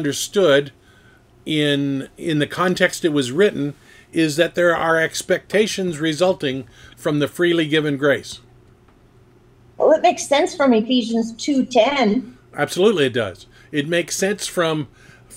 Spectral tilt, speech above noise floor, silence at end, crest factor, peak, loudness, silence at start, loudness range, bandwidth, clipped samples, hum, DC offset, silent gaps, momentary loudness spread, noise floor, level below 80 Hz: -4.5 dB/octave; 32 dB; 0 s; 18 dB; 0 dBFS; -19 LUFS; 0 s; 3 LU; 16.5 kHz; under 0.1%; none; under 0.1%; none; 10 LU; -51 dBFS; -56 dBFS